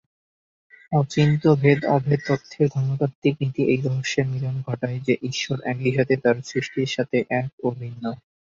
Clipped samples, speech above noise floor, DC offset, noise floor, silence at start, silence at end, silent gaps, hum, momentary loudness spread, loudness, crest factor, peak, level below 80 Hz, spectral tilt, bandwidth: under 0.1%; over 68 dB; under 0.1%; under -90 dBFS; 0.9 s; 0.4 s; 3.15-3.22 s, 7.53-7.58 s; none; 9 LU; -23 LUFS; 20 dB; -4 dBFS; -58 dBFS; -6.5 dB/octave; 7.6 kHz